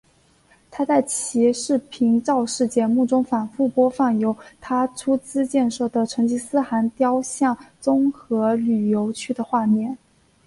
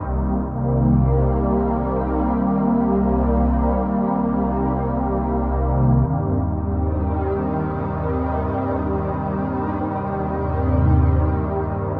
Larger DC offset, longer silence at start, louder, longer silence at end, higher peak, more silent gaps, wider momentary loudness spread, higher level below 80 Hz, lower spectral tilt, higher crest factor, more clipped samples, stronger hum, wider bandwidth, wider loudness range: neither; first, 0.7 s vs 0 s; about the same, -21 LUFS vs -21 LUFS; first, 0.5 s vs 0 s; about the same, -6 dBFS vs -6 dBFS; neither; about the same, 6 LU vs 6 LU; second, -62 dBFS vs -26 dBFS; second, -5 dB/octave vs -13 dB/octave; about the same, 16 dB vs 14 dB; neither; neither; first, 11.5 kHz vs 3.3 kHz; about the same, 2 LU vs 3 LU